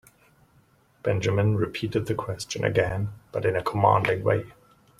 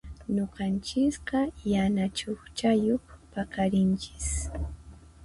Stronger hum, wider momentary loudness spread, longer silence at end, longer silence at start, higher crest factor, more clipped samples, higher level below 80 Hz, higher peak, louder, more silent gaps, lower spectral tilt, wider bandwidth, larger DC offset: neither; about the same, 11 LU vs 11 LU; first, 0.5 s vs 0 s; first, 1.05 s vs 0.05 s; first, 22 dB vs 16 dB; neither; second, -54 dBFS vs -42 dBFS; first, -4 dBFS vs -14 dBFS; first, -25 LUFS vs -29 LUFS; neither; about the same, -6 dB/octave vs -5.5 dB/octave; first, 13 kHz vs 11.5 kHz; neither